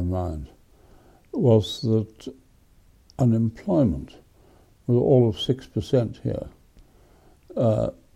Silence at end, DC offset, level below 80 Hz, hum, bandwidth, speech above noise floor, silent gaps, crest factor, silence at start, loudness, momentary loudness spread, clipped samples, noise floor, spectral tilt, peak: 0.25 s; under 0.1%; -46 dBFS; none; 12 kHz; 34 dB; none; 18 dB; 0 s; -23 LUFS; 20 LU; under 0.1%; -56 dBFS; -8.5 dB/octave; -6 dBFS